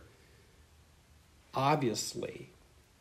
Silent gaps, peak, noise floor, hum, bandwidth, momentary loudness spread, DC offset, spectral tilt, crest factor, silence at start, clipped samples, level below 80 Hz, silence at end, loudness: none; -16 dBFS; -62 dBFS; none; 15.5 kHz; 20 LU; under 0.1%; -4.5 dB/octave; 22 dB; 0 s; under 0.1%; -66 dBFS; 0.55 s; -33 LUFS